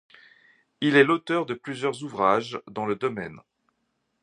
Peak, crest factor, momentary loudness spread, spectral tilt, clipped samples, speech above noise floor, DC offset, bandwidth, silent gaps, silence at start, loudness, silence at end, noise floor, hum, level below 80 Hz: -6 dBFS; 22 dB; 13 LU; -5.5 dB/octave; under 0.1%; 51 dB; under 0.1%; 10.5 kHz; none; 0.8 s; -25 LUFS; 0.85 s; -75 dBFS; none; -68 dBFS